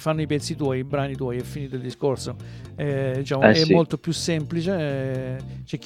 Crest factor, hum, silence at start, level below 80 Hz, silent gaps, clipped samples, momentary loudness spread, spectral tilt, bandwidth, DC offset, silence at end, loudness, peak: 22 dB; none; 0 s; -50 dBFS; none; under 0.1%; 15 LU; -6 dB/octave; 15 kHz; under 0.1%; 0 s; -24 LUFS; 0 dBFS